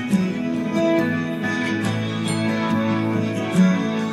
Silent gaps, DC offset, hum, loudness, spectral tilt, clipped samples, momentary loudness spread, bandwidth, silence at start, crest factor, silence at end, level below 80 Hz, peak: none; under 0.1%; none; -21 LUFS; -6.5 dB/octave; under 0.1%; 5 LU; 13 kHz; 0 s; 14 dB; 0 s; -60 dBFS; -6 dBFS